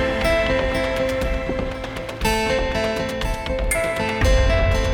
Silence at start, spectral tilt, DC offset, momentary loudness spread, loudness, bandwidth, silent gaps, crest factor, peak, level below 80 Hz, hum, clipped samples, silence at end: 0 s; -5 dB/octave; under 0.1%; 7 LU; -21 LUFS; 18.5 kHz; none; 14 dB; -8 dBFS; -26 dBFS; none; under 0.1%; 0 s